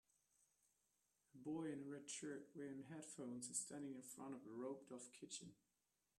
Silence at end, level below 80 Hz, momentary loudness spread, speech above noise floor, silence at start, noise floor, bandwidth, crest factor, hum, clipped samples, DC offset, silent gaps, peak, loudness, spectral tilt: 0.65 s; under -90 dBFS; 8 LU; 37 dB; 1.35 s; -90 dBFS; 13 kHz; 24 dB; none; under 0.1%; under 0.1%; none; -32 dBFS; -53 LUFS; -3.5 dB/octave